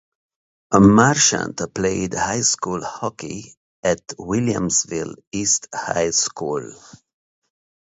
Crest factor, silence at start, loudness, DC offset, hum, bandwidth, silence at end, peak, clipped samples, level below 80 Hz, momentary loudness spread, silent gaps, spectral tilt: 20 dB; 0.7 s; -19 LUFS; under 0.1%; none; 8 kHz; 1.15 s; 0 dBFS; under 0.1%; -48 dBFS; 15 LU; 3.57-3.83 s, 5.27-5.31 s; -3.5 dB/octave